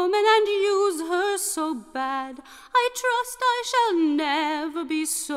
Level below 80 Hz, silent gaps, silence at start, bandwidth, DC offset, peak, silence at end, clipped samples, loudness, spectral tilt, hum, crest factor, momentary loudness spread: -64 dBFS; none; 0 s; 16 kHz; under 0.1%; -8 dBFS; 0 s; under 0.1%; -23 LUFS; -0.5 dB/octave; none; 16 dB; 9 LU